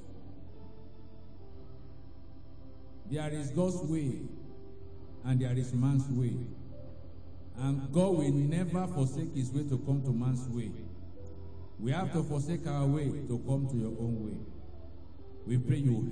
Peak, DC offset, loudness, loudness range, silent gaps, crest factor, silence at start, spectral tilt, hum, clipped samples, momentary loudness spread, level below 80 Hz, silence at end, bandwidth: -16 dBFS; 0.8%; -33 LUFS; 6 LU; none; 18 dB; 0 s; -8 dB/octave; none; under 0.1%; 23 LU; -54 dBFS; 0 s; 10 kHz